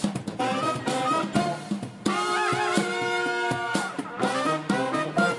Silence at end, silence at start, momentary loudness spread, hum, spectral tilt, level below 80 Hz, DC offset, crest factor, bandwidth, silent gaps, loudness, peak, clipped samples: 0 s; 0 s; 5 LU; none; -4.5 dB/octave; -64 dBFS; under 0.1%; 18 dB; 11.5 kHz; none; -26 LUFS; -8 dBFS; under 0.1%